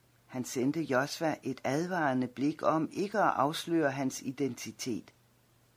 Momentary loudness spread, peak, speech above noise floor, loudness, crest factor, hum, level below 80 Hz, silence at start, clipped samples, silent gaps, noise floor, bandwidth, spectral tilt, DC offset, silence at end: 9 LU; -14 dBFS; 35 dB; -32 LUFS; 20 dB; none; -74 dBFS; 0.3 s; under 0.1%; none; -66 dBFS; 16 kHz; -5 dB/octave; under 0.1%; 0.75 s